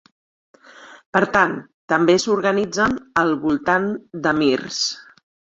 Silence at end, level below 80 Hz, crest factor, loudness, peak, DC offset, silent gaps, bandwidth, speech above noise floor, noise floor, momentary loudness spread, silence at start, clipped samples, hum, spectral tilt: 0.55 s; -54 dBFS; 20 dB; -19 LUFS; -2 dBFS; under 0.1%; 1.06-1.13 s, 1.74-1.88 s; 8 kHz; 26 dB; -45 dBFS; 7 LU; 0.8 s; under 0.1%; none; -4 dB/octave